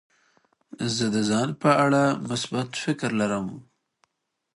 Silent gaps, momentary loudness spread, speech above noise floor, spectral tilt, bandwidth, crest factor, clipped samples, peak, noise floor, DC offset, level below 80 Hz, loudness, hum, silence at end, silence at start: none; 11 LU; 55 dB; -5 dB/octave; 11.5 kHz; 20 dB; under 0.1%; -6 dBFS; -79 dBFS; under 0.1%; -64 dBFS; -24 LUFS; none; 0.95 s; 0.8 s